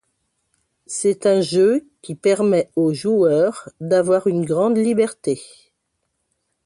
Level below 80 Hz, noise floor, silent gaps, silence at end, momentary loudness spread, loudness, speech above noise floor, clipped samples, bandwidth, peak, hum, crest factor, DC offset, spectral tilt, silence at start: -64 dBFS; -73 dBFS; none; 1.2 s; 9 LU; -18 LUFS; 56 dB; under 0.1%; 11.5 kHz; -4 dBFS; none; 14 dB; under 0.1%; -5.5 dB/octave; 0.9 s